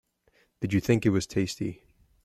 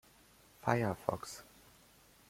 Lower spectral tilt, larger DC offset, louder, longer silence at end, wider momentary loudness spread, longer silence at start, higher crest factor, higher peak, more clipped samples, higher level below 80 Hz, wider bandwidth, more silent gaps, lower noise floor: about the same, -6 dB/octave vs -6 dB/octave; neither; first, -28 LUFS vs -37 LUFS; second, 0.5 s vs 0.85 s; second, 12 LU vs 17 LU; about the same, 0.6 s vs 0.65 s; second, 18 dB vs 26 dB; first, -10 dBFS vs -14 dBFS; neither; first, -56 dBFS vs -68 dBFS; about the same, 15 kHz vs 16.5 kHz; neither; about the same, -67 dBFS vs -64 dBFS